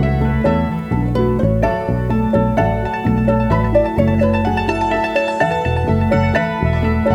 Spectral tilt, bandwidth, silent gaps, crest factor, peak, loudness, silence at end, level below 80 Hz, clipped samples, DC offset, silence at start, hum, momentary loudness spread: -8.5 dB/octave; 10.5 kHz; none; 14 dB; -2 dBFS; -16 LUFS; 0 s; -26 dBFS; under 0.1%; under 0.1%; 0 s; none; 3 LU